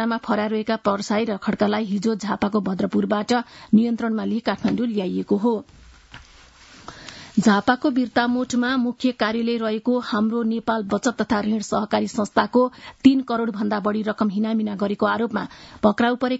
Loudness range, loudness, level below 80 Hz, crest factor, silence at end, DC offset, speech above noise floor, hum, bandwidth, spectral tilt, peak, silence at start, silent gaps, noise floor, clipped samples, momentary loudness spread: 2 LU; -22 LUFS; -56 dBFS; 20 dB; 0 s; under 0.1%; 27 dB; none; 8 kHz; -5.5 dB/octave; -2 dBFS; 0 s; none; -49 dBFS; under 0.1%; 5 LU